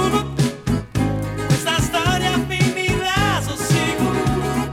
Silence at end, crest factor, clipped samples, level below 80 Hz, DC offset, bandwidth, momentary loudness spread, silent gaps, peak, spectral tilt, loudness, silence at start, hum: 0 s; 16 dB; under 0.1%; -34 dBFS; under 0.1%; 17 kHz; 4 LU; none; -4 dBFS; -5 dB/octave; -19 LUFS; 0 s; none